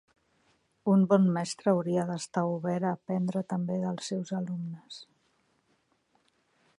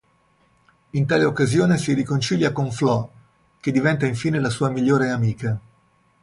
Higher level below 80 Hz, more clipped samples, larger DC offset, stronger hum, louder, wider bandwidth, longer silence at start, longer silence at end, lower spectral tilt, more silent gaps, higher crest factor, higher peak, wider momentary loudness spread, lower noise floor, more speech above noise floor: second, -76 dBFS vs -54 dBFS; neither; neither; neither; second, -29 LUFS vs -21 LUFS; about the same, 11 kHz vs 11.5 kHz; about the same, 0.85 s vs 0.95 s; first, 1.75 s vs 0.65 s; about the same, -7 dB/octave vs -6.5 dB/octave; neither; first, 22 dB vs 16 dB; about the same, -8 dBFS vs -6 dBFS; first, 13 LU vs 9 LU; first, -72 dBFS vs -61 dBFS; about the same, 44 dB vs 41 dB